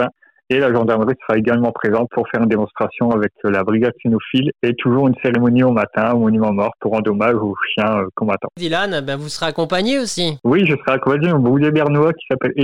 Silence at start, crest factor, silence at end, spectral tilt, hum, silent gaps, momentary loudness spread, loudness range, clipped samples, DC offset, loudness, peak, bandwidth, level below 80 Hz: 0 s; 10 dB; 0 s; -6.5 dB/octave; none; none; 6 LU; 3 LU; under 0.1%; under 0.1%; -17 LUFS; -6 dBFS; 11.5 kHz; -54 dBFS